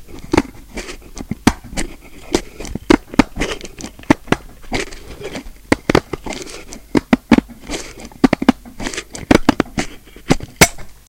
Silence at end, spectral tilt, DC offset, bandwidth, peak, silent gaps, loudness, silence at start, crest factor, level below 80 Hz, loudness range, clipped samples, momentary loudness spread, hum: 0.15 s; -4.5 dB/octave; under 0.1%; over 20 kHz; 0 dBFS; none; -18 LUFS; 0 s; 18 dB; -32 dBFS; 3 LU; 0.3%; 18 LU; none